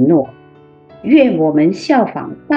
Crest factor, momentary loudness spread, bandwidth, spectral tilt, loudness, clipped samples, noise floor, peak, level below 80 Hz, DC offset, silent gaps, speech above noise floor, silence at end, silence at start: 14 dB; 16 LU; 7.6 kHz; -7.5 dB/octave; -13 LUFS; under 0.1%; -43 dBFS; 0 dBFS; -56 dBFS; under 0.1%; none; 31 dB; 0 s; 0 s